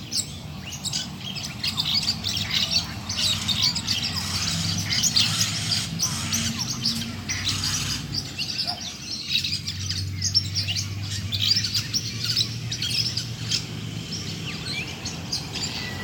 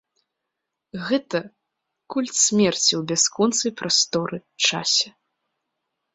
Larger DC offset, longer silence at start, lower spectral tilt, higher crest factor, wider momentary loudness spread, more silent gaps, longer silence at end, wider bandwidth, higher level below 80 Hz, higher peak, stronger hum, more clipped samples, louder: neither; second, 0 s vs 0.95 s; about the same, -2 dB/octave vs -2 dB/octave; about the same, 20 dB vs 20 dB; about the same, 10 LU vs 12 LU; neither; second, 0 s vs 1.05 s; first, 18 kHz vs 8.4 kHz; first, -50 dBFS vs -66 dBFS; about the same, -6 dBFS vs -6 dBFS; neither; neither; second, -24 LUFS vs -20 LUFS